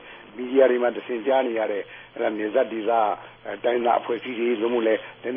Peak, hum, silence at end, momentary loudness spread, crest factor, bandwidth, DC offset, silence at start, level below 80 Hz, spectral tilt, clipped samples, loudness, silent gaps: -6 dBFS; none; 0 s; 12 LU; 18 dB; 3.7 kHz; under 0.1%; 0 s; -70 dBFS; -9 dB/octave; under 0.1%; -24 LUFS; none